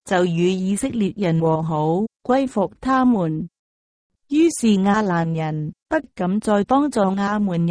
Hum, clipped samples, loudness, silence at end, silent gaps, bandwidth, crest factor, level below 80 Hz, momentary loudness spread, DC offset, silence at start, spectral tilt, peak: none; under 0.1%; -20 LUFS; 0 s; 3.59-4.10 s; 11 kHz; 14 dB; -52 dBFS; 7 LU; under 0.1%; 0.05 s; -6.5 dB/octave; -6 dBFS